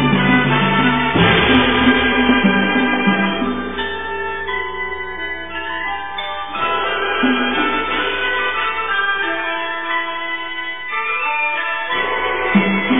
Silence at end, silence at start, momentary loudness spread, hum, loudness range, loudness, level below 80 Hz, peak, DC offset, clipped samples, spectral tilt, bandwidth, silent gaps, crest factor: 0 s; 0 s; 10 LU; none; 8 LU; -17 LUFS; -40 dBFS; 0 dBFS; 2%; under 0.1%; -9 dB/octave; 4 kHz; none; 18 dB